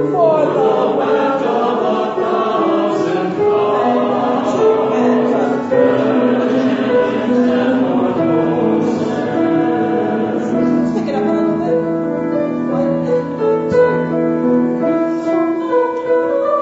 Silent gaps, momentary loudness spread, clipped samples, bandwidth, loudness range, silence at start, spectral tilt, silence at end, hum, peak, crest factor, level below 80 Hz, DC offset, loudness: none; 4 LU; under 0.1%; 8 kHz; 2 LU; 0 s; -7.5 dB/octave; 0 s; none; -2 dBFS; 14 dB; -56 dBFS; under 0.1%; -15 LUFS